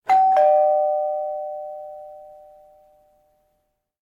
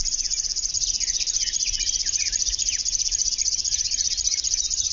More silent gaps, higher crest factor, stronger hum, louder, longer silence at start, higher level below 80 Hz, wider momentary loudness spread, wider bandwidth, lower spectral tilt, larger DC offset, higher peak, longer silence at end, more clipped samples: neither; about the same, 14 dB vs 16 dB; neither; about the same, -19 LUFS vs -21 LUFS; about the same, 0.05 s vs 0 s; second, -72 dBFS vs -42 dBFS; first, 22 LU vs 2 LU; about the same, 7.2 kHz vs 7.4 kHz; first, -3.5 dB/octave vs 2.5 dB/octave; neither; about the same, -8 dBFS vs -10 dBFS; first, 1.85 s vs 0 s; neither